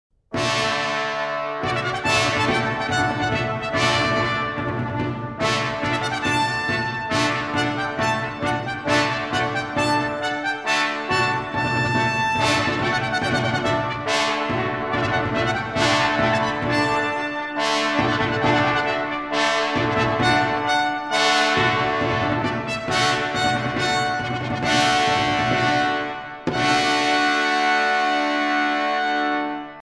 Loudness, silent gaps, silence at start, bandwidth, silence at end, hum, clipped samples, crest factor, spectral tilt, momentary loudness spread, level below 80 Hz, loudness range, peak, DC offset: -21 LUFS; none; 0.3 s; 11 kHz; 0.05 s; none; under 0.1%; 20 dB; -4 dB/octave; 6 LU; -48 dBFS; 3 LU; -2 dBFS; under 0.1%